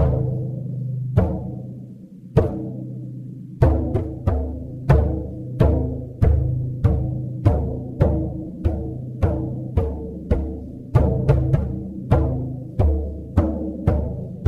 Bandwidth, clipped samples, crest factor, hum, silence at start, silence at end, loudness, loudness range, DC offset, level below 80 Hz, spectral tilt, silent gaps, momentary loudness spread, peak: 4.7 kHz; under 0.1%; 20 dB; none; 0 s; 0 s; -23 LUFS; 3 LU; under 0.1%; -26 dBFS; -10.5 dB/octave; none; 12 LU; 0 dBFS